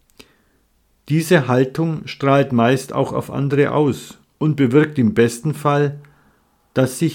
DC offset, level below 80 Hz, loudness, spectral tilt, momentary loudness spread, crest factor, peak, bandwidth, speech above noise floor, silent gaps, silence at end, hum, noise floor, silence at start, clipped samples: under 0.1%; -56 dBFS; -18 LUFS; -6.5 dB/octave; 7 LU; 18 dB; 0 dBFS; 17 kHz; 44 dB; none; 0 s; none; -61 dBFS; 1.05 s; under 0.1%